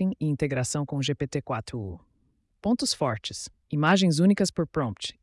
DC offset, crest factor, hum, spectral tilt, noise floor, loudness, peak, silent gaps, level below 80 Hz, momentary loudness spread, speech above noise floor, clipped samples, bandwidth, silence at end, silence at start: under 0.1%; 18 dB; none; -5 dB/octave; -69 dBFS; -26 LUFS; -10 dBFS; none; -56 dBFS; 14 LU; 43 dB; under 0.1%; 12 kHz; 0.1 s; 0 s